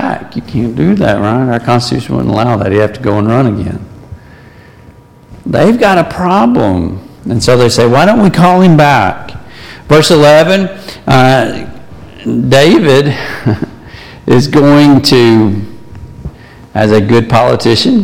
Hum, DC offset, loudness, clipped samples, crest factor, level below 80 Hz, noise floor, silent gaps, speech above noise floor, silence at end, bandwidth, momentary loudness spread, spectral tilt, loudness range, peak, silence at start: none; under 0.1%; -8 LUFS; under 0.1%; 8 dB; -34 dBFS; -37 dBFS; none; 30 dB; 0 s; 16.5 kHz; 17 LU; -6 dB/octave; 5 LU; 0 dBFS; 0 s